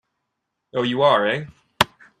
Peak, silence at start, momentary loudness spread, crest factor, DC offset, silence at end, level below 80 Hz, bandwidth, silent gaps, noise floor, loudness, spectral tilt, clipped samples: 0 dBFS; 0.75 s; 12 LU; 22 dB; under 0.1%; 0.35 s; -58 dBFS; 14 kHz; none; -78 dBFS; -21 LUFS; -4.5 dB/octave; under 0.1%